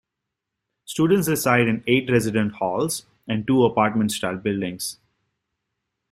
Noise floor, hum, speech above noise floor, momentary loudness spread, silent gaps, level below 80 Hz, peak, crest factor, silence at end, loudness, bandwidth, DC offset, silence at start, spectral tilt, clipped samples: -83 dBFS; none; 62 dB; 10 LU; none; -58 dBFS; -2 dBFS; 20 dB; 1.2 s; -22 LUFS; 16 kHz; under 0.1%; 0.9 s; -5 dB/octave; under 0.1%